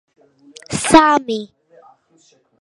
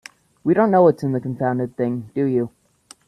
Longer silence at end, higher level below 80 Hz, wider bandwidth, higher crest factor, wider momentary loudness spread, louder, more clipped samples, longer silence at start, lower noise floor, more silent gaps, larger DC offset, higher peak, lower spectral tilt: first, 1.15 s vs 0.6 s; first, -46 dBFS vs -60 dBFS; about the same, 11.5 kHz vs 12 kHz; about the same, 18 dB vs 18 dB; first, 16 LU vs 10 LU; first, -14 LUFS vs -20 LUFS; neither; first, 0.7 s vs 0.45 s; first, -56 dBFS vs -51 dBFS; neither; neither; about the same, 0 dBFS vs -2 dBFS; second, -3.5 dB/octave vs -9 dB/octave